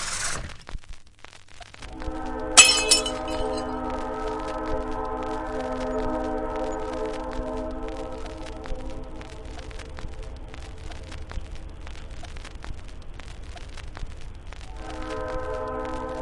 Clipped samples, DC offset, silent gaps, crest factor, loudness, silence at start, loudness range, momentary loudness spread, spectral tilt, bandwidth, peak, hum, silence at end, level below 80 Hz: under 0.1%; 0.1%; none; 28 dB; -24 LUFS; 0 s; 20 LU; 16 LU; -1.5 dB/octave; 11.5 kHz; 0 dBFS; none; 0 s; -38 dBFS